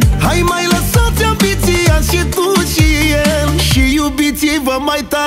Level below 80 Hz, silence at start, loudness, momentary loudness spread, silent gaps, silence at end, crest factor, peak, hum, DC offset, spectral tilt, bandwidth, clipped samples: -18 dBFS; 0 s; -12 LUFS; 3 LU; none; 0 s; 12 dB; 0 dBFS; none; under 0.1%; -4.5 dB/octave; 16.5 kHz; under 0.1%